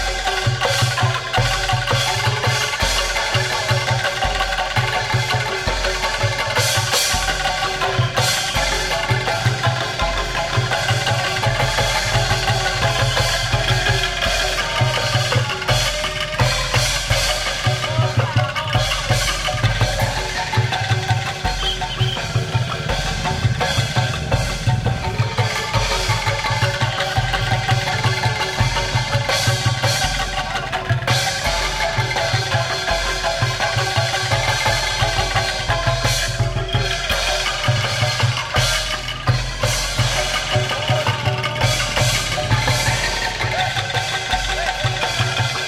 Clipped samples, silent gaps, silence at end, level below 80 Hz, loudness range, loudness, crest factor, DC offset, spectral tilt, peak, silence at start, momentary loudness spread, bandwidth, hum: under 0.1%; none; 0 s; -30 dBFS; 2 LU; -19 LUFS; 16 dB; under 0.1%; -3 dB/octave; -4 dBFS; 0 s; 3 LU; 16 kHz; none